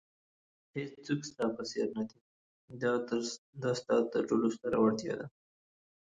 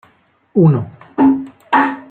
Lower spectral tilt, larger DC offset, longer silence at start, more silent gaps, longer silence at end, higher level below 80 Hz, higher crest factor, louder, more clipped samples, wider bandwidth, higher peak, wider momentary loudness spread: second, -5.5 dB/octave vs -10 dB/octave; neither; first, 0.75 s vs 0.55 s; first, 2.21-2.68 s, 3.38-3.53 s vs none; first, 0.85 s vs 0.1 s; second, -72 dBFS vs -54 dBFS; about the same, 18 dB vs 14 dB; second, -34 LUFS vs -15 LUFS; neither; first, 9.4 kHz vs 4.4 kHz; second, -16 dBFS vs -2 dBFS; first, 12 LU vs 8 LU